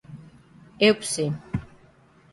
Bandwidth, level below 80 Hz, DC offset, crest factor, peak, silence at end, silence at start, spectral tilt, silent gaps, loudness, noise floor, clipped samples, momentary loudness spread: 11.5 kHz; -52 dBFS; under 0.1%; 22 dB; -6 dBFS; 0.65 s; 0.1 s; -4 dB/octave; none; -24 LUFS; -56 dBFS; under 0.1%; 23 LU